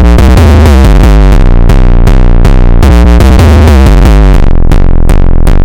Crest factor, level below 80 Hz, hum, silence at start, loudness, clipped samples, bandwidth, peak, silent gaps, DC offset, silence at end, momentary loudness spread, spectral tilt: 0 dB; -2 dBFS; none; 0 s; -5 LUFS; 1%; 16 kHz; 0 dBFS; none; under 0.1%; 0 s; 5 LU; -7 dB/octave